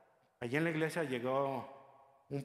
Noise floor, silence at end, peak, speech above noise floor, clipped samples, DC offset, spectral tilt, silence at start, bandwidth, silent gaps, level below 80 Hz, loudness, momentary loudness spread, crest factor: -63 dBFS; 0 s; -20 dBFS; 27 dB; under 0.1%; under 0.1%; -6.5 dB/octave; 0.4 s; 15 kHz; none; -78 dBFS; -37 LUFS; 11 LU; 18 dB